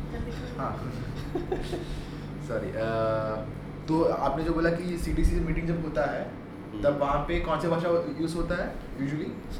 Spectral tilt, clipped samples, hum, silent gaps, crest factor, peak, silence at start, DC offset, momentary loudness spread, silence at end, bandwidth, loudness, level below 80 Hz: -7 dB/octave; under 0.1%; none; none; 18 dB; -12 dBFS; 0 s; under 0.1%; 10 LU; 0 s; 15 kHz; -30 LUFS; -36 dBFS